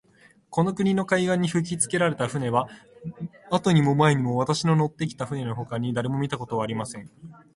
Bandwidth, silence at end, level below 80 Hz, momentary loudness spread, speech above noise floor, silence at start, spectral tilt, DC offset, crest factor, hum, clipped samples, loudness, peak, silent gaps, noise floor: 11.5 kHz; 0.2 s; -60 dBFS; 16 LU; 33 dB; 0.5 s; -5.5 dB/octave; under 0.1%; 18 dB; none; under 0.1%; -24 LUFS; -6 dBFS; none; -58 dBFS